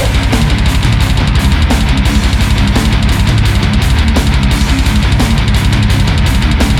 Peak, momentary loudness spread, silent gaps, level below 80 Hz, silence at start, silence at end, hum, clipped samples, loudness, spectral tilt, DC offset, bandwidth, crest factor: 0 dBFS; 1 LU; none; -12 dBFS; 0 s; 0 s; none; under 0.1%; -11 LUFS; -5.5 dB/octave; under 0.1%; 15.5 kHz; 8 dB